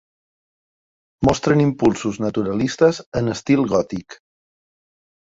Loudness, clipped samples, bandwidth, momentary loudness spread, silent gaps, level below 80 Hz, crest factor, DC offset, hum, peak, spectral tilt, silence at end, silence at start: -19 LUFS; under 0.1%; 8 kHz; 7 LU; 3.06-3.12 s; -46 dBFS; 20 dB; under 0.1%; none; -2 dBFS; -6.5 dB/octave; 1.1 s; 1.2 s